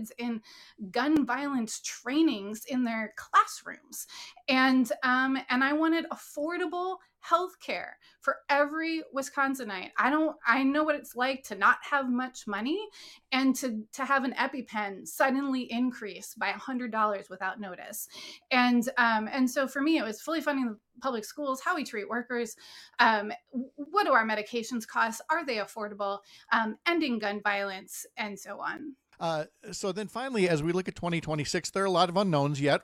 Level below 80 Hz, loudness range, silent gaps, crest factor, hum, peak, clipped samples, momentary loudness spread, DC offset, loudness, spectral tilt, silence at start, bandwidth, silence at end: -68 dBFS; 4 LU; none; 24 dB; none; -6 dBFS; under 0.1%; 13 LU; under 0.1%; -29 LUFS; -4.5 dB/octave; 0 s; 16 kHz; 0 s